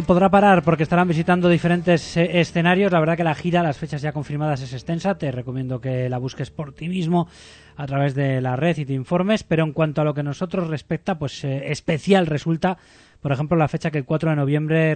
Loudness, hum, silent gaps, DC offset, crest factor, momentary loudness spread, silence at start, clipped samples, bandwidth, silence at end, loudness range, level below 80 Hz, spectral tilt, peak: -21 LUFS; none; none; under 0.1%; 18 dB; 10 LU; 0 s; under 0.1%; 9 kHz; 0 s; 7 LU; -48 dBFS; -7 dB/octave; -2 dBFS